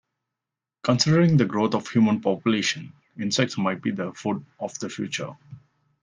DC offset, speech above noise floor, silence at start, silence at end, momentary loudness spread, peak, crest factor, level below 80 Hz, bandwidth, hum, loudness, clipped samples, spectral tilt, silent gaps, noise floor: under 0.1%; 65 dB; 0.85 s; 0.45 s; 13 LU; -4 dBFS; 20 dB; -64 dBFS; 10 kHz; none; -24 LUFS; under 0.1%; -5.5 dB/octave; none; -88 dBFS